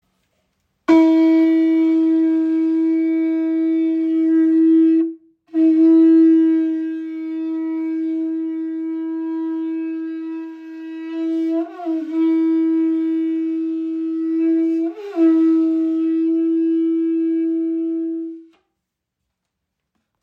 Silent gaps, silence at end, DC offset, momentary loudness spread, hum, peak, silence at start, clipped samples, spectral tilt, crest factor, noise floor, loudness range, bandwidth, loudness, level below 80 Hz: none; 1.8 s; under 0.1%; 12 LU; none; -4 dBFS; 0.9 s; under 0.1%; -6.5 dB/octave; 14 dB; -79 dBFS; 9 LU; 4.4 kHz; -18 LUFS; -74 dBFS